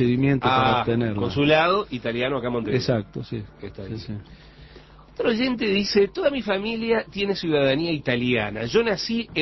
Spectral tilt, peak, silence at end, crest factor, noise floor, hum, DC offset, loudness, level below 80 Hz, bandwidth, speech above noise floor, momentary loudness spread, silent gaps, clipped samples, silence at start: -6.5 dB/octave; -6 dBFS; 0 s; 18 dB; -47 dBFS; none; under 0.1%; -22 LUFS; -48 dBFS; 6.2 kHz; 24 dB; 15 LU; none; under 0.1%; 0 s